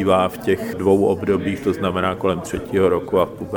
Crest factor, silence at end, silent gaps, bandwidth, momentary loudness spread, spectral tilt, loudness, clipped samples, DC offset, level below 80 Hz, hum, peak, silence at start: 18 dB; 0 s; none; over 20 kHz; 5 LU; -6.5 dB/octave; -20 LUFS; under 0.1%; under 0.1%; -46 dBFS; none; -2 dBFS; 0 s